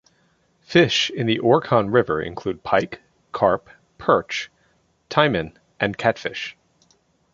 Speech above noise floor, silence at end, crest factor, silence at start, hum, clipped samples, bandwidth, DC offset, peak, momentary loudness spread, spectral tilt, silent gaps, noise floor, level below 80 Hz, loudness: 43 dB; 0.85 s; 22 dB; 0.7 s; none; under 0.1%; 7.6 kHz; under 0.1%; 0 dBFS; 14 LU; -5 dB/octave; none; -63 dBFS; -54 dBFS; -21 LUFS